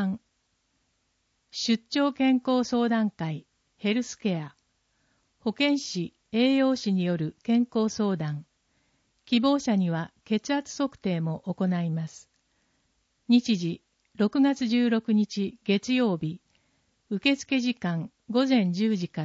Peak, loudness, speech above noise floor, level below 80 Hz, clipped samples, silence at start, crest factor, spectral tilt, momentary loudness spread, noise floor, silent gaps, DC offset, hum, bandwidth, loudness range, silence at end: -10 dBFS; -27 LUFS; 48 dB; -70 dBFS; under 0.1%; 0 s; 18 dB; -5.5 dB/octave; 11 LU; -74 dBFS; none; under 0.1%; none; 8 kHz; 3 LU; 0 s